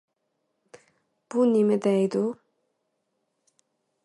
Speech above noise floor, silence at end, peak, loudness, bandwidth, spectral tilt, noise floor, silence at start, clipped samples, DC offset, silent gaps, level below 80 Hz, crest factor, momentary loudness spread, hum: 55 dB; 1.7 s; -12 dBFS; -24 LUFS; 11.5 kHz; -7.5 dB/octave; -77 dBFS; 1.3 s; under 0.1%; under 0.1%; none; -80 dBFS; 16 dB; 10 LU; none